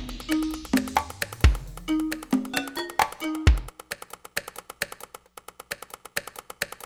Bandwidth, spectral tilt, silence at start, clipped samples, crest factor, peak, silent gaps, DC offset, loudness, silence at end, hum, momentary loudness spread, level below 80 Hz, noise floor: 18.5 kHz; -5 dB/octave; 0 s; under 0.1%; 24 dB; -4 dBFS; none; under 0.1%; -28 LUFS; 0 s; none; 16 LU; -32 dBFS; -47 dBFS